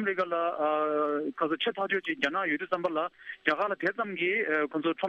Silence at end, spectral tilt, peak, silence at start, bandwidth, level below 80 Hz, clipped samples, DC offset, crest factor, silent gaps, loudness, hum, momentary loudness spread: 0 s; -5.5 dB/octave; -10 dBFS; 0 s; 8 kHz; -78 dBFS; under 0.1%; under 0.1%; 18 dB; none; -29 LUFS; none; 3 LU